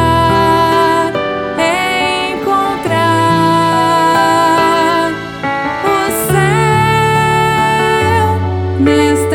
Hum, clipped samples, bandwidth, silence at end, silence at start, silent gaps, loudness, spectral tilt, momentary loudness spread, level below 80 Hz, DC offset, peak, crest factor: none; under 0.1%; 19.5 kHz; 0 s; 0 s; none; -12 LUFS; -5 dB/octave; 5 LU; -40 dBFS; under 0.1%; 0 dBFS; 12 dB